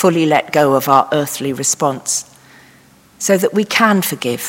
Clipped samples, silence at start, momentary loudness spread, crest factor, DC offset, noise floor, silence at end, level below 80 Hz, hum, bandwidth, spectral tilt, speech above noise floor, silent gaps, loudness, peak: 0.1%; 0 s; 7 LU; 16 dB; under 0.1%; -47 dBFS; 0 s; -62 dBFS; none; 17 kHz; -3.5 dB/octave; 33 dB; none; -15 LUFS; 0 dBFS